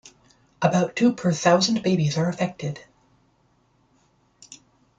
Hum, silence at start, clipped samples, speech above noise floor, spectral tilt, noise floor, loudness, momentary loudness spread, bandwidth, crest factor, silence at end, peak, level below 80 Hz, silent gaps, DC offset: none; 0.6 s; under 0.1%; 42 dB; -5.5 dB/octave; -64 dBFS; -22 LUFS; 12 LU; 9 kHz; 20 dB; 0.45 s; -4 dBFS; -62 dBFS; none; under 0.1%